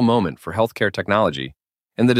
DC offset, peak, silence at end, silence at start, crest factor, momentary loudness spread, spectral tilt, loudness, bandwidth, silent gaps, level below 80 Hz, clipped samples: under 0.1%; -2 dBFS; 0 s; 0 s; 18 dB; 13 LU; -6.5 dB/octave; -21 LUFS; 15 kHz; none; -52 dBFS; under 0.1%